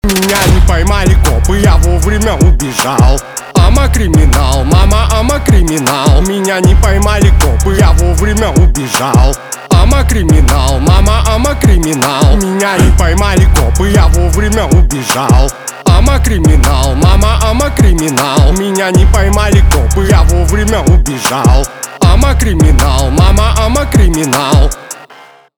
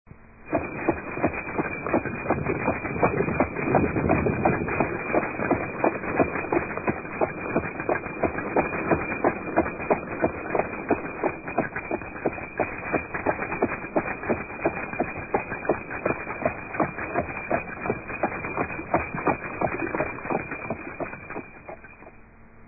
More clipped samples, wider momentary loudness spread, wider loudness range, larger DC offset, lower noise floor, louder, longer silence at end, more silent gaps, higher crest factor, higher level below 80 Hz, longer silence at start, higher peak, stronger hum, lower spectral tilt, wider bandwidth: neither; second, 3 LU vs 6 LU; second, 1 LU vs 4 LU; neither; second, -37 dBFS vs -49 dBFS; first, -9 LUFS vs -27 LUFS; first, 0.6 s vs 0 s; neither; second, 8 dB vs 20 dB; first, -10 dBFS vs -46 dBFS; about the same, 0.05 s vs 0.15 s; first, 0 dBFS vs -8 dBFS; neither; second, -5 dB/octave vs -14.5 dB/octave; first, 19.5 kHz vs 2.7 kHz